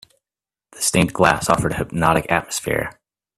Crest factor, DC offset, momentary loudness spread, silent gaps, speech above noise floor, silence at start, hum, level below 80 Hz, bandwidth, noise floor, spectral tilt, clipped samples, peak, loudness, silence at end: 20 dB; under 0.1%; 7 LU; none; over 71 dB; 0.75 s; none; -42 dBFS; 16 kHz; under -90 dBFS; -4 dB/octave; under 0.1%; 0 dBFS; -19 LUFS; 0.45 s